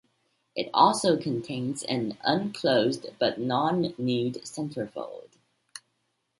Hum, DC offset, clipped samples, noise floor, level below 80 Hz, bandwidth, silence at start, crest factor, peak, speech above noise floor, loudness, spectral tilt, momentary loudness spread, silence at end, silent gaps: none; under 0.1%; under 0.1%; -76 dBFS; -70 dBFS; 11.5 kHz; 0.55 s; 22 dB; -6 dBFS; 49 dB; -27 LUFS; -5 dB/octave; 19 LU; 0.6 s; none